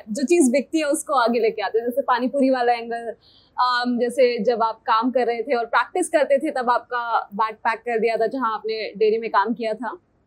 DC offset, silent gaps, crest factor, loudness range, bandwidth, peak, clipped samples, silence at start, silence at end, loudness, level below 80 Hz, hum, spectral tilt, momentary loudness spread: under 0.1%; none; 16 dB; 2 LU; 16 kHz; -6 dBFS; under 0.1%; 0.05 s; 0.3 s; -21 LUFS; -70 dBFS; none; -3.5 dB/octave; 7 LU